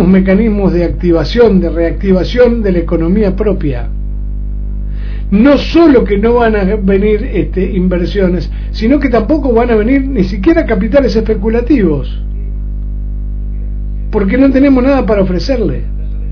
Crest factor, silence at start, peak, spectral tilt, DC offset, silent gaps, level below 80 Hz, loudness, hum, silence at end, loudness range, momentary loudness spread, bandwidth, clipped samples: 10 dB; 0 s; 0 dBFS; -8.5 dB/octave; under 0.1%; none; -18 dBFS; -11 LUFS; 50 Hz at -20 dBFS; 0 s; 3 LU; 13 LU; 5.4 kHz; 0.6%